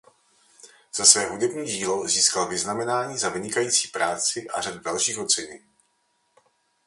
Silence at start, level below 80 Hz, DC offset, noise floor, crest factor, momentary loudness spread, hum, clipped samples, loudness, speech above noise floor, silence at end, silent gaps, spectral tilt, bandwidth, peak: 0.65 s; -64 dBFS; under 0.1%; -70 dBFS; 26 dB; 12 LU; none; under 0.1%; -22 LUFS; 45 dB; 1.3 s; none; -1 dB/octave; 11.5 kHz; 0 dBFS